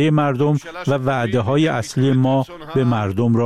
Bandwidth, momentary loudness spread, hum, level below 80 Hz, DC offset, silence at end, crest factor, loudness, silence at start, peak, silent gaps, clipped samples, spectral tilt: 12.5 kHz; 5 LU; none; -50 dBFS; 0.4%; 0 s; 12 dB; -19 LUFS; 0 s; -6 dBFS; none; under 0.1%; -7.5 dB/octave